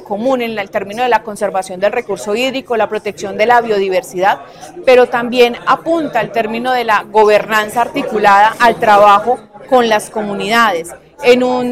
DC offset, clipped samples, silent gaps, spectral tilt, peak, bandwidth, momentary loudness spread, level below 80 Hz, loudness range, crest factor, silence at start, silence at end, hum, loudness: 0.1%; under 0.1%; none; -4 dB/octave; 0 dBFS; 15.5 kHz; 10 LU; -50 dBFS; 5 LU; 12 dB; 0 s; 0 s; none; -13 LUFS